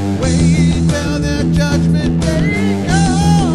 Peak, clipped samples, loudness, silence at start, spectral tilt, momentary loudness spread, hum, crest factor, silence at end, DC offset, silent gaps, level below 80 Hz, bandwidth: -2 dBFS; under 0.1%; -14 LUFS; 0 s; -6 dB/octave; 4 LU; none; 12 dB; 0 s; 1%; none; -24 dBFS; 11.5 kHz